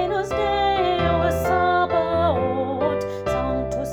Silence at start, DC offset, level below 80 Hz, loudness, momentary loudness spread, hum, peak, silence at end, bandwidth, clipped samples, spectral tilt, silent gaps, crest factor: 0 s; under 0.1%; -38 dBFS; -21 LUFS; 5 LU; none; -8 dBFS; 0 s; 19.5 kHz; under 0.1%; -6 dB/octave; none; 14 dB